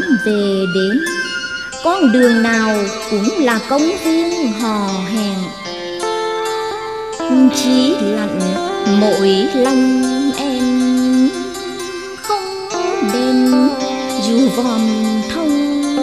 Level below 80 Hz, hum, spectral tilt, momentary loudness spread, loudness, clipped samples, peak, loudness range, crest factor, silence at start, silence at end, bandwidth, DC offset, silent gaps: -50 dBFS; none; -4.5 dB/octave; 10 LU; -15 LUFS; under 0.1%; 0 dBFS; 3 LU; 14 dB; 0 s; 0 s; 14 kHz; 0.3%; none